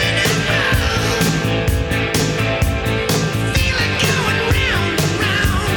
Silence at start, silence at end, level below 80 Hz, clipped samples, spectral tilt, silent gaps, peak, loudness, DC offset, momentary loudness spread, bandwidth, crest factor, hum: 0 s; 0 s; -26 dBFS; under 0.1%; -4 dB/octave; none; -4 dBFS; -16 LUFS; under 0.1%; 3 LU; 19.5 kHz; 12 dB; none